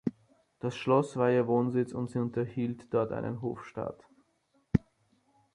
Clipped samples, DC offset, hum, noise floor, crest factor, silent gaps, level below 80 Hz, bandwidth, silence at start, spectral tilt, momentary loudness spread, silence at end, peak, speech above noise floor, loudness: under 0.1%; under 0.1%; none; -72 dBFS; 24 dB; none; -56 dBFS; 11 kHz; 0.05 s; -8 dB/octave; 11 LU; 0.75 s; -8 dBFS; 42 dB; -31 LUFS